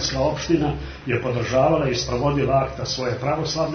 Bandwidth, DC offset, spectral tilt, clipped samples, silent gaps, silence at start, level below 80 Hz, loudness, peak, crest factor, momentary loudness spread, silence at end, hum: 6.6 kHz; under 0.1%; -5.5 dB/octave; under 0.1%; none; 0 s; -38 dBFS; -22 LUFS; -6 dBFS; 16 dB; 6 LU; 0 s; none